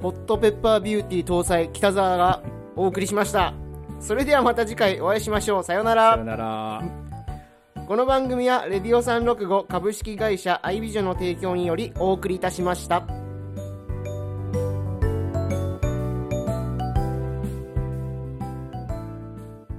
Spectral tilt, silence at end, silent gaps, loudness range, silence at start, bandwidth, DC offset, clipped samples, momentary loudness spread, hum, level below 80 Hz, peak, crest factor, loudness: -5.5 dB/octave; 0 s; none; 6 LU; 0 s; 15 kHz; under 0.1%; under 0.1%; 14 LU; none; -38 dBFS; -6 dBFS; 18 dB; -24 LUFS